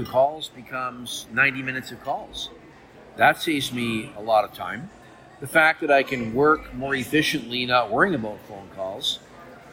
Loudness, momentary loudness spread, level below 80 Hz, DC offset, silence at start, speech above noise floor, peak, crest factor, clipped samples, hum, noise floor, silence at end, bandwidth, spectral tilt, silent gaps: -23 LUFS; 15 LU; -54 dBFS; under 0.1%; 0 s; 24 dB; -4 dBFS; 20 dB; under 0.1%; none; -47 dBFS; 0 s; 16.5 kHz; -4 dB/octave; none